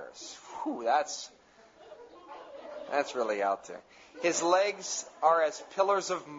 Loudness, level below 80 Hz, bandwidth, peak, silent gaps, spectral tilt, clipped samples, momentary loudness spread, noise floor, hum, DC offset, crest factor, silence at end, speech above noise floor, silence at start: -30 LUFS; -78 dBFS; 8 kHz; -12 dBFS; none; -2 dB/octave; under 0.1%; 21 LU; -57 dBFS; none; under 0.1%; 20 dB; 0 s; 27 dB; 0 s